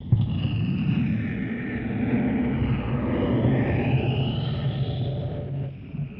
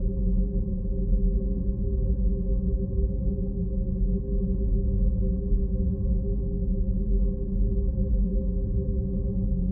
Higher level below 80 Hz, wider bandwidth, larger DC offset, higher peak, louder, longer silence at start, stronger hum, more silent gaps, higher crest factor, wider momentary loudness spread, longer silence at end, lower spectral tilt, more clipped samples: second, -40 dBFS vs -26 dBFS; first, 5.2 kHz vs 1.1 kHz; neither; first, -8 dBFS vs -12 dBFS; about the same, -26 LUFS vs -28 LUFS; about the same, 0 s vs 0 s; neither; neither; about the same, 16 dB vs 12 dB; first, 8 LU vs 3 LU; about the same, 0 s vs 0 s; second, -11 dB/octave vs -17.5 dB/octave; neither